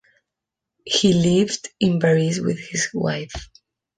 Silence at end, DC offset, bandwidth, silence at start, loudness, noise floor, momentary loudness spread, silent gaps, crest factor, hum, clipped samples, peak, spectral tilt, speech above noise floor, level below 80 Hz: 0.55 s; under 0.1%; 10 kHz; 0.85 s; -20 LUFS; -84 dBFS; 10 LU; none; 18 dB; none; under 0.1%; -4 dBFS; -5 dB/octave; 65 dB; -48 dBFS